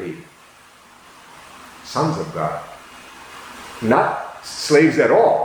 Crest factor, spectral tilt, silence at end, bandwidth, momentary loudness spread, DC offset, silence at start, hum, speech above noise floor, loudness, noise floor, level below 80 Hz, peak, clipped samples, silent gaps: 20 dB; -5 dB/octave; 0 s; 20 kHz; 25 LU; under 0.1%; 0 s; none; 31 dB; -18 LUFS; -47 dBFS; -58 dBFS; -2 dBFS; under 0.1%; none